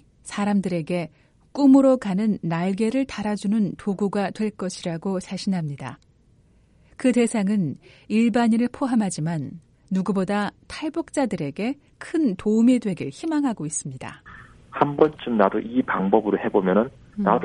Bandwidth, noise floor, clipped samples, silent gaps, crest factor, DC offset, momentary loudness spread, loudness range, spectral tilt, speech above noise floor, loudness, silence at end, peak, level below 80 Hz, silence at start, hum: 11.5 kHz; -57 dBFS; under 0.1%; none; 20 dB; under 0.1%; 11 LU; 5 LU; -6.5 dB/octave; 35 dB; -23 LUFS; 0 s; -2 dBFS; -58 dBFS; 0.25 s; none